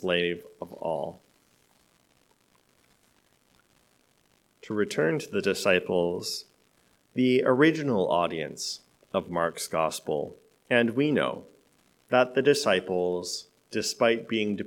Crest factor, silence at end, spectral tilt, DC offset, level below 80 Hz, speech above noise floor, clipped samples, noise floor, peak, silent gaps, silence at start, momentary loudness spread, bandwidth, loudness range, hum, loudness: 22 dB; 0 s; -4.5 dB/octave; under 0.1%; -72 dBFS; 40 dB; under 0.1%; -67 dBFS; -6 dBFS; none; 0 s; 13 LU; 18 kHz; 11 LU; none; -27 LUFS